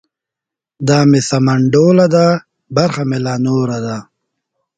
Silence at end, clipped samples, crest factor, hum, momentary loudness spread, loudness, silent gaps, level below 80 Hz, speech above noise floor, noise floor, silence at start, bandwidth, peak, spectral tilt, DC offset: 0.75 s; under 0.1%; 14 dB; none; 11 LU; -13 LUFS; none; -52 dBFS; 73 dB; -85 dBFS; 0.8 s; 9.4 kHz; 0 dBFS; -6.5 dB/octave; under 0.1%